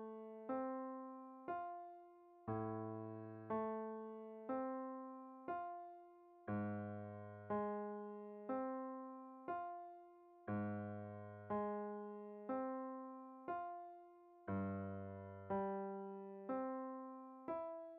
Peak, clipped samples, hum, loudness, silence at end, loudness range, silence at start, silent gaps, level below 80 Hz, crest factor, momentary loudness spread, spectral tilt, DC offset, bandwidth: -32 dBFS; under 0.1%; none; -48 LUFS; 0 s; 1 LU; 0 s; none; -84 dBFS; 16 dB; 10 LU; -8.5 dB/octave; under 0.1%; 3.9 kHz